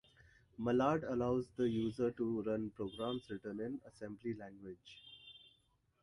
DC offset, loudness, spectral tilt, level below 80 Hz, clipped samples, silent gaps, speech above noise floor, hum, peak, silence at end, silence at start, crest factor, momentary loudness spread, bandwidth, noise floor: under 0.1%; -39 LUFS; -7.5 dB/octave; -68 dBFS; under 0.1%; none; 37 dB; none; -20 dBFS; 0.65 s; 0.6 s; 20 dB; 20 LU; 11.5 kHz; -76 dBFS